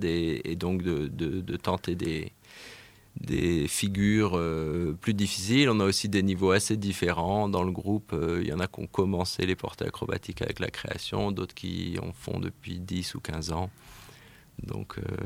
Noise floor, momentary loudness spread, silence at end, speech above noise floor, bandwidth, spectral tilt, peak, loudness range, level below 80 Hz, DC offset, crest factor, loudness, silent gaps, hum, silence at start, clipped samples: -53 dBFS; 14 LU; 0 s; 24 dB; 16.5 kHz; -5 dB/octave; -8 dBFS; 8 LU; -48 dBFS; under 0.1%; 20 dB; -29 LUFS; none; none; 0 s; under 0.1%